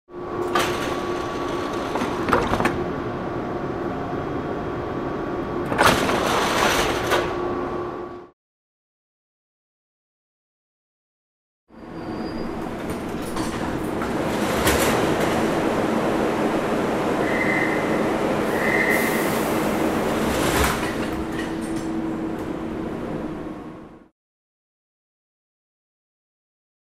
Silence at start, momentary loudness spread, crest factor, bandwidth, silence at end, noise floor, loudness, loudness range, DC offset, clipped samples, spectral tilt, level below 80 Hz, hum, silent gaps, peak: 0.1 s; 10 LU; 22 dB; 16 kHz; 2.9 s; under -90 dBFS; -23 LUFS; 13 LU; under 0.1%; under 0.1%; -4.5 dB/octave; -42 dBFS; none; 8.33-11.67 s; -2 dBFS